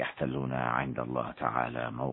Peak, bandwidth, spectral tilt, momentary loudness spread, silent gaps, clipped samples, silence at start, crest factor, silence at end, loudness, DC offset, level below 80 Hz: -12 dBFS; 4.1 kHz; -10.5 dB/octave; 3 LU; none; under 0.1%; 0 s; 20 dB; 0 s; -33 LUFS; under 0.1%; -58 dBFS